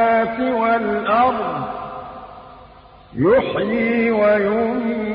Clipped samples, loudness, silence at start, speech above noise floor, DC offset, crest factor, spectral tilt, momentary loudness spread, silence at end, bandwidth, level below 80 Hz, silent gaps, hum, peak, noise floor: under 0.1%; -18 LUFS; 0 s; 26 dB; under 0.1%; 14 dB; -11 dB/octave; 17 LU; 0 s; 5.2 kHz; -50 dBFS; none; none; -6 dBFS; -44 dBFS